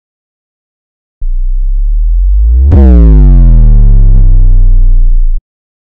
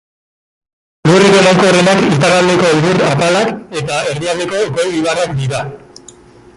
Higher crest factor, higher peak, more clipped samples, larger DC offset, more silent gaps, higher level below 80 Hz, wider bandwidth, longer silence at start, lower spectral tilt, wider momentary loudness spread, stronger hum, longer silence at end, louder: second, 4 dB vs 12 dB; about the same, 0 dBFS vs 0 dBFS; neither; neither; neither; first, -4 dBFS vs -46 dBFS; second, 1.7 kHz vs 11.5 kHz; first, 1.2 s vs 1.05 s; first, -12 dB/octave vs -5 dB/octave; first, 13 LU vs 10 LU; neither; second, 0.55 s vs 0.8 s; first, -8 LUFS vs -11 LUFS